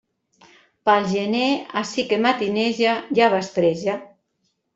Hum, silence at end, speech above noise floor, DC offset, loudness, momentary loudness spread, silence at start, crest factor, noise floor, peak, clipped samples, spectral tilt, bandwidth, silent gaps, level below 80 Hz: none; 0.7 s; 52 dB; under 0.1%; -21 LUFS; 7 LU; 0.85 s; 18 dB; -72 dBFS; -2 dBFS; under 0.1%; -5 dB/octave; 8 kHz; none; -64 dBFS